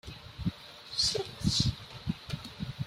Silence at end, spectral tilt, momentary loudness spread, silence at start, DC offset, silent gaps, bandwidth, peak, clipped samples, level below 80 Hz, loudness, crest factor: 0 s; -4 dB/octave; 13 LU; 0.05 s; under 0.1%; none; 16 kHz; -14 dBFS; under 0.1%; -48 dBFS; -33 LUFS; 20 dB